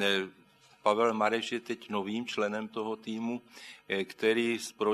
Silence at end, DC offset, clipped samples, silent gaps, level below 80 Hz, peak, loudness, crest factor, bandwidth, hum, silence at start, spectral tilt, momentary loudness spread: 0 s; under 0.1%; under 0.1%; none; -82 dBFS; -10 dBFS; -32 LUFS; 22 dB; 13.5 kHz; none; 0 s; -4 dB/octave; 10 LU